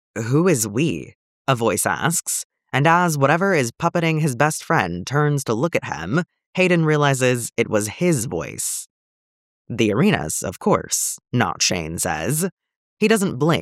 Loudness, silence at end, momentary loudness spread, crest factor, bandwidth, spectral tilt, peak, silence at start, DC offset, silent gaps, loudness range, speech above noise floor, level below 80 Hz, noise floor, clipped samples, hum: -20 LUFS; 0 s; 8 LU; 18 dB; 16.5 kHz; -4.5 dB/octave; -2 dBFS; 0.15 s; under 0.1%; 1.15-1.45 s, 2.44-2.50 s, 6.46-6.53 s, 8.90-9.65 s, 12.52-12.57 s, 12.76-12.97 s; 3 LU; over 70 dB; -54 dBFS; under -90 dBFS; under 0.1%; none